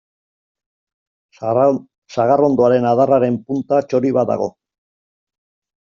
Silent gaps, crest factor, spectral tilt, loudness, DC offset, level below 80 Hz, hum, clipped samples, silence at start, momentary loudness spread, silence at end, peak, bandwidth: 1.98-2.02 s; 16 dB; -7.5 dB/octave; -16 LUFS; under 0.1%; -60 dBFS; none; under 0.1%; 1.4 s; 11 LU; 1.35 s; -2 dBFS; 7.2 kHz